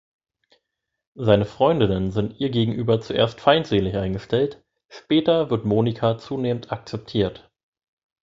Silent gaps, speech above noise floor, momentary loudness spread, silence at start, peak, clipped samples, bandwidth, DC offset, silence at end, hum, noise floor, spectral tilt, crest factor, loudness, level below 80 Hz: none; 59 dB; 8 LU; 1.15 s; 0 dBFS; under 0.1%; 7.6 kHz; under 0.1%; 0.9 s; none; -80 dBFS; -7.5 dB/octave; 22 dB; -22 LUFS; -48 dBFS